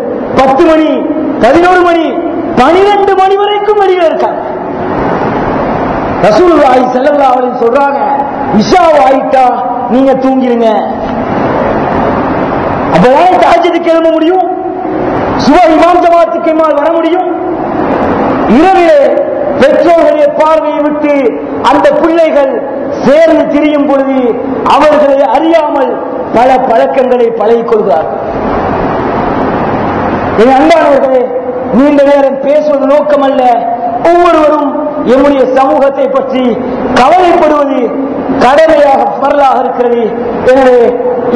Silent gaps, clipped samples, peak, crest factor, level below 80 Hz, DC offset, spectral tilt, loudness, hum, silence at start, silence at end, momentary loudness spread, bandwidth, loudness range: none; 7%; 0 dBFS; 6 dB; -34 dBFS; 0.2%; -6.5 dB/octave; -7 LUFS; none; 0 s; 0 s; 7 LU; 11 kHz; 2 LU